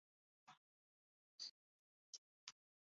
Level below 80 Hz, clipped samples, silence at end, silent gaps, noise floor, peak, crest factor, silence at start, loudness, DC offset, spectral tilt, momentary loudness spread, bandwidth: under -90 dBFS; under 0.1%; 0.4 s; 0.57-1.39 s, 1.51-2.47 s; under -90 dBFS; -34 dBFS; 30 dB; 0.45 s; -58 LUFS; under 0.1%; 3 dB/octave; 7 LU; 7.4 kHz